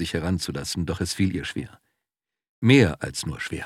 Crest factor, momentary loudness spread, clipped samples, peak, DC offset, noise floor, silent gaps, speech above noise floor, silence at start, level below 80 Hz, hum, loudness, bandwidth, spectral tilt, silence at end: 22 dB; 13 LU; under 0.1%; -4 dBFS; under 0.1%; -88 dBFS; 2.49-2.62 s; 65 dB; 0 s; -46 dBFS; none; -24 LUFS; 15 kHz; -5.5 dB/octave; 0 s